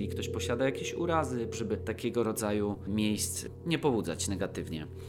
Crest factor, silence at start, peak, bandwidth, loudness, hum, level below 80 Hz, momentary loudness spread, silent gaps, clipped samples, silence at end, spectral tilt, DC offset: 18 dB; 0 s; -14 dBFS; 16.5 kHz; -32 LUFS; none; -54 dBFS; 5 LU; none; under 0.1%; 0 s; -5 dB/octave; under 0.1%